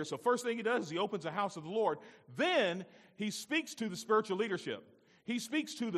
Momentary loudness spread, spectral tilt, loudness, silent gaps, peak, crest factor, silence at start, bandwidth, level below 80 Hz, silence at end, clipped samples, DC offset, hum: 12 LU; -4 dB/octave; -35 LUFS; none; -18 dBFS; 18 dB; 0 s; 14.5 kHz; -86 dBFS; 0 s; under 0.1%; under 0.1%; none